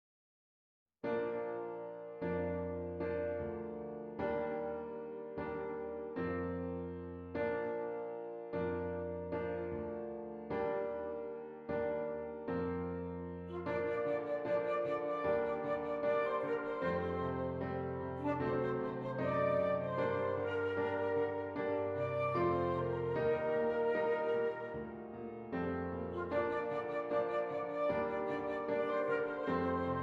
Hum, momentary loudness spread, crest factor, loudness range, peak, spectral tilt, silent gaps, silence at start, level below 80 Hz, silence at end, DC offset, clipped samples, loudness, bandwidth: none; 9 LU; 16 dB; 5 LU; -22 dBFS; -9 dB/octave; none; 1.05 s; -68 dBFS; 0 s; under 0.1%; under 0.1%; -38 LUFS; 6 kHz